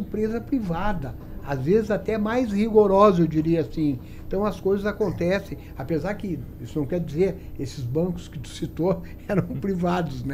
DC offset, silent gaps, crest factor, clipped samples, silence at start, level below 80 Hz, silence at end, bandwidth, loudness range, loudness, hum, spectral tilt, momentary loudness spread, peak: under 0.1%; none; 20 dB; under 0.1%; 0 s; -40 dBFS; 0 s; 15 kHz; 6 LU; -24 LUFS; none; -8 dB/octave; 14 LU; -4 dBFS